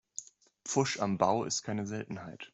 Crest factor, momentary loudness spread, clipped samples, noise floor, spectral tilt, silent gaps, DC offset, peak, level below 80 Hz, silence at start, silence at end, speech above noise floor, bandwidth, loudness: 22 dB; 16 LU; under 0.1%; -53 dBFS; -4 dB/octave; none; under 0.1%; -12 dBFS; -72 dBFS; 0.2 s; 0.05 s; 21 dB; 8.2 kHz; -33 LUFS